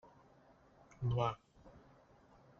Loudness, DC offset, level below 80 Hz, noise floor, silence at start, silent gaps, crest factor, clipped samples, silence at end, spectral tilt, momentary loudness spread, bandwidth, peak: -39 LUFS; under 0.1%; -62 dBFS; -66 dBFS; 1 s; none; 22 dB; under 0.1%; 0.8 s; -6.5 dB/octave; 26 LU; 6.8 kHz; -22 dBFS